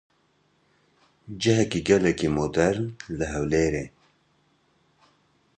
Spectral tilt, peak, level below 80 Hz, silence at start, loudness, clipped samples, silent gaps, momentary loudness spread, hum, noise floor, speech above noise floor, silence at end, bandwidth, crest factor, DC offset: -5.5 dB/octave; -6 dBFS; -46 dBFS; 1.3 s; -24 LUFS; under 0.1%; none; 11 LU; none; -66 dBFS; 43 dB; 1.7 s; 9.8 kHz; 22 dB; under 0.1%